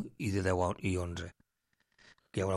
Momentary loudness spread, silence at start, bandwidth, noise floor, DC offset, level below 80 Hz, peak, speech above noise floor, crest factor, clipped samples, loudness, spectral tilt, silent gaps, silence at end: 11 LU; 0 s; 12.5 kHz; -80 dBFS; under 0.1%; -62 dBFS; -18 dBFS; 47 dB; 18 dB; under 0.1%; -35 LUFS; -6 dB/octave; none; 0 s